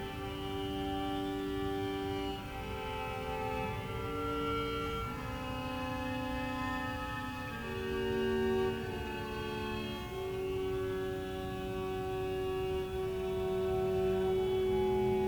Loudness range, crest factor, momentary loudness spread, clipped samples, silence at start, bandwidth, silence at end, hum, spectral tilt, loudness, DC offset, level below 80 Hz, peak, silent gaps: 3 LU; 14 dB; 7 LU; under 0.1%; 0 s; 19.5 kHz; 0 s; none; -6 dB/octave; -36 LUFS; under 0.1%; -48 dBFS; -22 dBFS; none